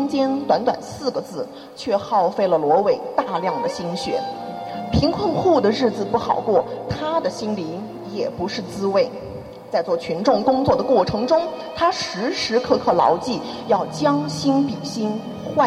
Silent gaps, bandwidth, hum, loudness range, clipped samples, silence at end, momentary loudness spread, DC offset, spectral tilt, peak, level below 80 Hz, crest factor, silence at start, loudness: none; 13.5 kHz; none; 4 LU; under 0.1%; 0 s; 11 LU; under 0.1%; -5.5 dB/octave; -2 dBFS; -48 dBFS; 18 dB; 0 s; -21 LUFS